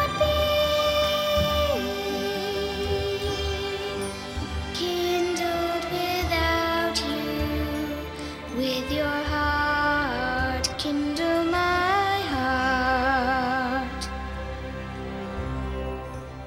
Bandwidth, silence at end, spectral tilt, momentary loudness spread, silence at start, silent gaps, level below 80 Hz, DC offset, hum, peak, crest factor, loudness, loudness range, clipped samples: 16 kHz; 0 s; -4.5 dB/octave; 10 LU; 0 s; none; -38 dBFS; under 0.1%; none; -8 dBFS; 16 dB; -26 LUFS; 4 LU; under 0.1%